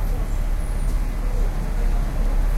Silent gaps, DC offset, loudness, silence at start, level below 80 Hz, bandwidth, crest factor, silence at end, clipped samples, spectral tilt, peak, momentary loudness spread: none; under 0.1%; -27 LUFS; 0 s; -20 dBFS; 13.5 kHz; 10 dB; 0 s; under 0.1%; -6.5 dB/octave; -10 dBFS; 2 LU